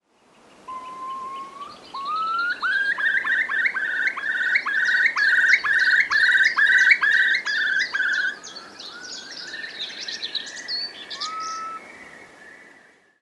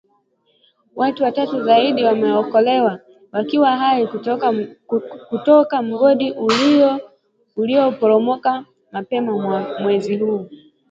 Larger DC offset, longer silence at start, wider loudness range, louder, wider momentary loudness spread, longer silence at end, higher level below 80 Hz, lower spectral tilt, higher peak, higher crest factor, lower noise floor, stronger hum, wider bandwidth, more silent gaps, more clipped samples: neither; second, 0.65 s vs 0.95 s; first, 13 LU vs 3 LU; second, -20 LUFS vs -17 LUFS; first, 20 LU vs 13 LU; first, 0.6 s vs 0.35 s; second, -72 dBFS vs -66 dBFS; second, 1 dB/octave vs -6 dB/octave; second, -4 dBFS vs 0 dBFS; about the same, 20 dB vs 18 dB; second, -56 dBFS vs -62 dBFS; neither; first, 11.5 kHz vs 7.8 kHz; neither; neither